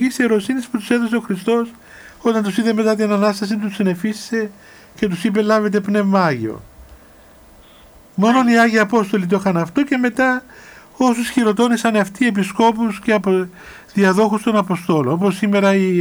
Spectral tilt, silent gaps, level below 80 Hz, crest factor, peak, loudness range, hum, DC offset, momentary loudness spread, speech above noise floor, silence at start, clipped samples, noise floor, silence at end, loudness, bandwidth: -6 dB/octave; none; -54 dBFS; 16 dB; -2 dBFS; 3 LU; none; under 0.1%; 8 LU; 29 dB; 0 s; under 0.1%; -45 dBFS; 0 s; -17 LUFS; over 20 kHz